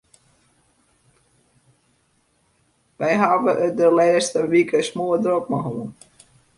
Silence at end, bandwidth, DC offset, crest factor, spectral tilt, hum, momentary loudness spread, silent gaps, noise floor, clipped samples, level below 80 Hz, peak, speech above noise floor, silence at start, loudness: 0.65 s; 11.5 kHz; under 0.1%; 20 dB; -5 dB/octave; none; 10 LU; none; -64 dBFS; under 0.1%; -64 dBFS; -2 dBFS; 46 dB; 3 s; -19 LUFS